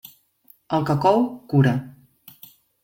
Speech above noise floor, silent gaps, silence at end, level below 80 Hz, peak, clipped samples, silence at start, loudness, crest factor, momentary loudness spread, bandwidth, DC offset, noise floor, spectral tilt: 37 dB; none; 0.95 s; -58 dBFS; -4 dBFS; under 0.1%; 0.7 s; -21 LUFS; 18 dB; 7 LU; 17 kHz; under 0.1%; -57 dBFS; -8 dB/octave